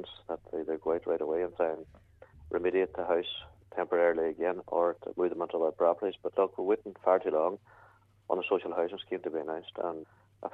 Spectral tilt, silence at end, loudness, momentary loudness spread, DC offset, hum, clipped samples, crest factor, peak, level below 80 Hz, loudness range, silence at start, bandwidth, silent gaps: -7.5 dB/octave; 0.05 s; -32 LUFS; 11 LU; under 0.1%; none; under 0.1%; 20 dB; -12 dBFS; -66 dBFS; 3 LU; 0 s; 4.1 kHz; none